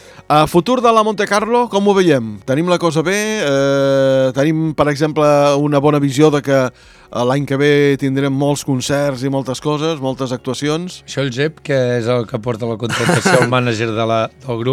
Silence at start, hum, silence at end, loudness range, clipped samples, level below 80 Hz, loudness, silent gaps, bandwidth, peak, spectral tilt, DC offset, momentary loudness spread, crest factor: 0.3 s; none; 0 s; 5 LU; under 0.1%; -50 dBFS; -15 LUFS; none; 15.5 kHz; 0 dBFS; -5.5 dB/octave; under 0.1%; 8 LU; 14 dB